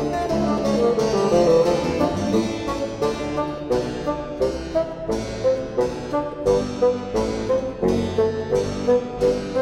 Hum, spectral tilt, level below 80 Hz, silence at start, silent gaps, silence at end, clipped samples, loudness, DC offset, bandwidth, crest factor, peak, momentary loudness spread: none; -6 dB/octave; -40 dBFS; 0 s; none; 0 s; under 0.1%; -22 LUFS; under 0.1%; 13 kHz; 16 dB; -6 dBFS; 7 LU